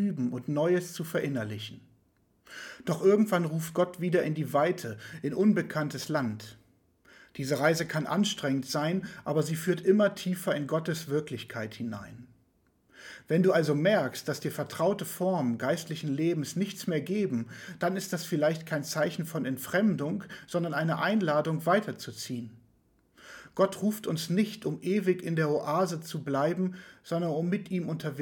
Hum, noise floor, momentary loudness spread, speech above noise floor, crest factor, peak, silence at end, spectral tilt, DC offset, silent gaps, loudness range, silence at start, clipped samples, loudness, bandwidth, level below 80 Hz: none; -69 dBFS; 13 LU; 39 dB; 18 dB; -12 dBFS; 0 s; -6 dB/octave; under 0.1%; none; 3 LU; 0 s; under 0.1%; -30 LUFS; 19 kHz; -72 dBFS